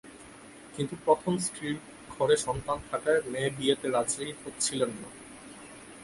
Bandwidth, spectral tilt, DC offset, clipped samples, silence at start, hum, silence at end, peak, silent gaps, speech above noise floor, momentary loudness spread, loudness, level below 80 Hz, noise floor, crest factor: 11.5 kHz; -3.5 dB/octave; under 0.1%; under 0.1%; 0.05 s; none; 0 s; -8 dBFS; none; 20 dB; 20 LU; -30 LUFS; -58 dBFS; -49 dBFS; 22 dB